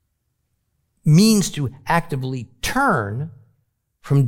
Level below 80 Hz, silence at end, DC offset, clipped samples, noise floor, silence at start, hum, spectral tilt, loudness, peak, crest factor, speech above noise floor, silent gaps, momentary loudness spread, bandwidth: -44 dBFS; 0 s; under 0.1%; under 0.1%; -71 dBFS; 1.05 s; none; -5.5 dB/octave; -19 LUFS; -4 dBFS; 16 dB; 53 dB; none; 14 LU; 17 kHz